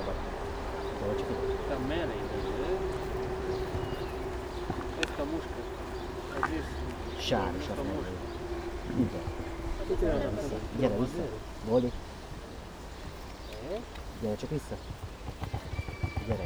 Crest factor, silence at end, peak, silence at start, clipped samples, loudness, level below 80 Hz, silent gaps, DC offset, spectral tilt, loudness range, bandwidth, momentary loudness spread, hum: 22 dB; 0 s; -10 dBFS; 0 s; under 0.1%; -35 LUFS; -42 dBFS; none; under 0.1%; -6 dB/octave; 6 LU; over 20 kHz; 12 LU; none